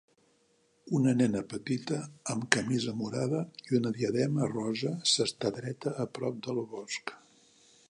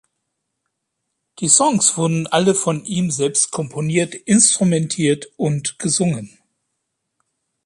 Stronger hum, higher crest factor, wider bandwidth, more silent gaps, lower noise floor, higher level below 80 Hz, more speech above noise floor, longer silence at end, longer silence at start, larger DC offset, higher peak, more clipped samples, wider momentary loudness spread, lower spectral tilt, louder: neither; first, 32 dB vs 20 dB; about the same, 11 kHz vs 11.5 kHz; neither; second, -69 dBFS vs -76 dBFS; second, -70 dBFS vs -60 dBFS; second, 38 dB vs 58 dB; second, 0.75 s vs 1.4 s; second, 0.85 s vs 1.4 s; neither; about the same, -2 dBFS vs 0 dBFS; neither; about the same, 9 LU vs 9 LU; about the same, -4.5 dB/octave vs -4 dB/octave; second, -31 LUFS vs -17 LUFS